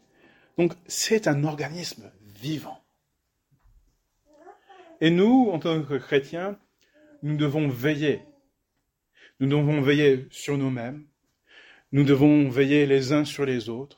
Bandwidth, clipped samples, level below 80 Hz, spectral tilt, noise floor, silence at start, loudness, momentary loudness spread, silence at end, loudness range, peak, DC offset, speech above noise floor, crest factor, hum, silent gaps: 17 kHz; under 0.1%; -62 dBFS; -6 dB/octave; -77 dBFS; 0.6 s; -24 LUFS; 16 LU; 0.1 s; 7 LU; -6 dBFS; under 0.1%; 54 dB; 18 dB; none; none